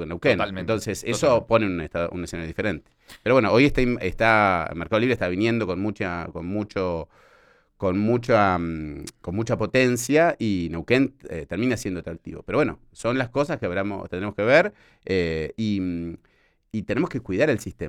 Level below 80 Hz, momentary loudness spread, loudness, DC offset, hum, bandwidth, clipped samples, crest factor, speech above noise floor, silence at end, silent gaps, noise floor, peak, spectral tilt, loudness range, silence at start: -44 dBFS; 13 LU; -23 LUFS; under 0.1%; none; 16 kHz; under 0.1%; 20 dB; 34 dB; 0 s; none; -58 dBFS; -4 dBFS; -6 dB/octave; 5 LU; 0 s